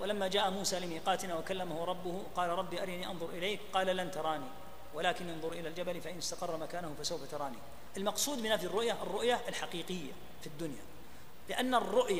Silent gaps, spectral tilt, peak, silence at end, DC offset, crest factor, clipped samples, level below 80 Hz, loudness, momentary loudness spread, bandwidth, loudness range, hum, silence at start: none; -3 dB/octave; -16 dBFS; 0 s; 0.7%; 20 dB; under 0.1%; -64 dBFS; -36 LUFS; 15 LU; 15.5 kHz; 3 LU; none; 0 s